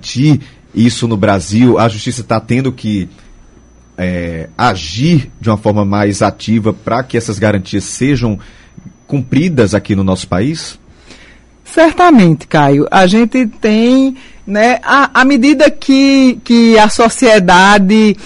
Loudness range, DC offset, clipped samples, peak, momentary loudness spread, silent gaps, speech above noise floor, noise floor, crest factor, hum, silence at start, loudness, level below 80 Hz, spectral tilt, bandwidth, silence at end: 8 LU; under 0.1%; under 0.1%; 0 dBFS; 12 LU; none; 32 dB; -42 dBFS; 10 dB; none; 0.05 s; -10 LUFS; -38 dBFS; -5.5 dB/octave; 11.5 kHz; 0 s